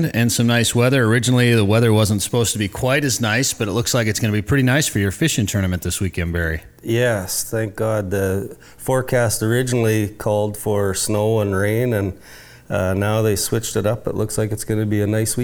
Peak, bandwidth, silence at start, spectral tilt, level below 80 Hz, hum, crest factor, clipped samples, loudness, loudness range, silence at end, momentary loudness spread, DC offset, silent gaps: -6 dBFS; over 20 kHz; 0 s; -5 dB/octave; -42 dBFS; none; 12 dB; under 0.1%; -19 LUFS; 4 LU; 0 s; 7 LU; under 0.1%; none